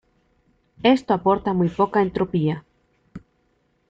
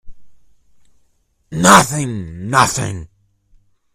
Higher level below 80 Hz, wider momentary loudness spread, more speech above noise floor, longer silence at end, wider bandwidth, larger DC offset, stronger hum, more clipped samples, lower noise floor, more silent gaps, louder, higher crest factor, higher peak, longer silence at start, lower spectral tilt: second, -54 dBFS vs -44 dBFS; second, 4 LU vs 18 LU; about the same, 46 dB vs 46 dB; second, 0.7 s vs 0.9 s; second, 7.8 kHz vs over 20 kHz; neither; neither; second, under 0.1% vs 0.1%; first, -66 dBFS vs -60 dBFS; neither; second, -21 LUFS vs -14 LUFS; about the same, 20 dB vs 18 dB; second, -4 dBFS vs 0 dBFS; first, 0.85 s vs 0.05 s; first, -8 dB/octave vs -3.5 dB/octave